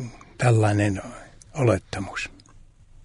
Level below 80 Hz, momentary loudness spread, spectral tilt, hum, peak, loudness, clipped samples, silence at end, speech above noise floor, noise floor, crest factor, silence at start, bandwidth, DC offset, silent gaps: -50 dBFS; 19 LU; -6.5 dB/octave; none; -6 dBFS; -24 LUFS; under 0.1%; 0.75 s; 28 dB; -50 dBFS; 18 dB; 0 s; 11 kHz; under 0.1%; none